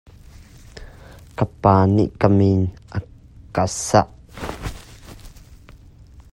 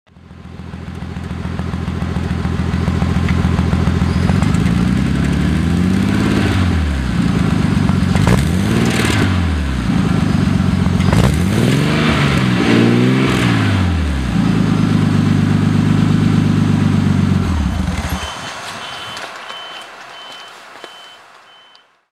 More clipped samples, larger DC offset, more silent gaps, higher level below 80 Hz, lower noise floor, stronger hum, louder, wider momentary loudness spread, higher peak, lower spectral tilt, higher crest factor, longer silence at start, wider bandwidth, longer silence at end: neither; neither; neither; second, -42 dBFS vs -26 dBFS; about the same, -45 dBFS vs -48 dBFS; neither; second, -19 LUFS vs -15 LUFS; first, 26 LU vs 14 LU; about the same, 0 dBFS vs 0 dBFS; about the same, -6.5 dB/octave vs -6.5 dB/octave; first, 22 dB vs 14 dB; first, 0.75 s vs 0.3 s; second, 12.5 kHz vs 15 kHz; second, 0.8 s vs 0.95 s